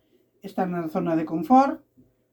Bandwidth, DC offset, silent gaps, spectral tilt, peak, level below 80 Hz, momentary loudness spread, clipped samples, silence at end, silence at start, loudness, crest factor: 18.5 kHz; under 0.1%; none; -8 dB/octave; -6 dBFS; -66 dBFS; 18 LU; under 0.1%; 0.55 s; 0.45 s; -23 LUFS; 20 dB